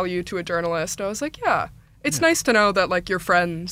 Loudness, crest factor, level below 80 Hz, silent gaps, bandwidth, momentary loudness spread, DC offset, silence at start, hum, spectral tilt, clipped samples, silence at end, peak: -22 LUFS; 18 dB; -50 dBFS; none; 16 kHz; 9 LU; under 0.1%; 0 s; none; -3.5 dB/octave; under 0.1%; 0 s; -4 dBFS